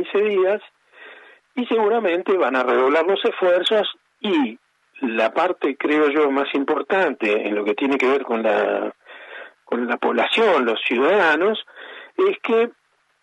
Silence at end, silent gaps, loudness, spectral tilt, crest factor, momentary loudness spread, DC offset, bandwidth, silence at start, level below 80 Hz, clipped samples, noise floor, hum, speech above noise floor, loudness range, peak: 0.5 s; none; -20 LUFS; -5 dB/octave; 14 dB; 11 LU; under 0.1%; 11 kHz; 0 s; -80 dBFS; under 0.1%; -46 dBFS; none; 27 dB; 2 LU; -6 dBFS